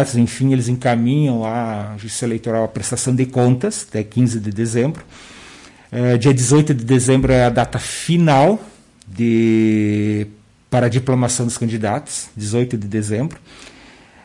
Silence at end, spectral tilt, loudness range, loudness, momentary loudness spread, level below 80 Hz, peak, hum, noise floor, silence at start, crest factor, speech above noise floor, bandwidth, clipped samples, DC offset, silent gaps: 0.55 s; -6 dB/octave; 5 LU; -17 LUFS; 10 LU; -42 dBFS; -4 dBFS; none; -44 dBFS; 0 s; 12 dB; 28 dB; 11.5 kHz; under 0.1%; under 0.1%; none